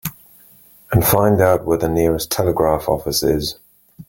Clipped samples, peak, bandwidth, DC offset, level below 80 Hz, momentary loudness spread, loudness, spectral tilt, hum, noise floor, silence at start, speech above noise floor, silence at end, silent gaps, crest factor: under 0.1%; -2 dBFS; 17 kHz; under 0.1%; -38 dBFS; 6 LU; -17 LUFS; -5 dB/octave; none; -48 dBFS; 0.05 s; 31 dB; 0.05 s; none; 16 dB